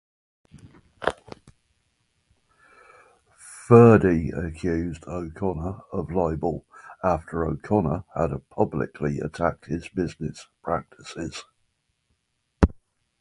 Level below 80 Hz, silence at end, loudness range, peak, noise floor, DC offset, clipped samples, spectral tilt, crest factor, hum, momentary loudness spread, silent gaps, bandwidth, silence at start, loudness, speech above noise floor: -40 dBFS; 0.5 s; 10 LU; 0 dBFS; -73 dBFS; under 0.1%; under 0.1%; -8 dB/octave; 24 dB; none; 17 LU; none; 11.5 kHz; 0.55 s; -24 LUFS; 50 dB